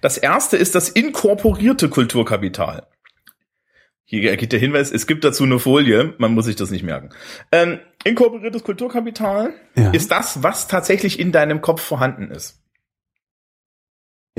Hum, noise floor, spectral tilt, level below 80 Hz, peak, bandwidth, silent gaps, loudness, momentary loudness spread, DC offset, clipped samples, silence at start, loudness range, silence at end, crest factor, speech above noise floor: none; -61 dBFS; -4.5 dB/octave; -44 dBFS; -2 dBFS; 16 kHz; 4.00-4.04 s; -17 LUFS; 10 LU; under 0.1%; under 0.1%; 0.05 s; 4 LU; 1.9 s; 16 dB; 44 dB